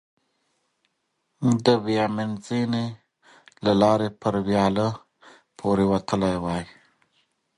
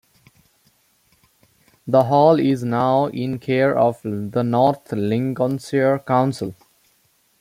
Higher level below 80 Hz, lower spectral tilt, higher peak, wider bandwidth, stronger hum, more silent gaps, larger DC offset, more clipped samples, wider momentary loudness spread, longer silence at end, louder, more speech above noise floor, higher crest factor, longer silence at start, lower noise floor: first, -52 dBFS vs -62 dBFS; about the same, -6.5 dB/octave vs -7.5 dB/octave; about the same, -4 dBFS vs -2 dBFS; second, 11.5 kHz vs 16 kHz; neither; neither; neither; neither; about the same, 10 LU vs 10 LU; about the same, 0.95 s vs 0.85 s; second, -24 LUFS vs -19 LUFS; first, 53 dB vs 43 dB; about the same, 20 dB vs 18 dB; second, 1.4 s vs 1.85 s; first, -75 dBFS vs -62 dBFS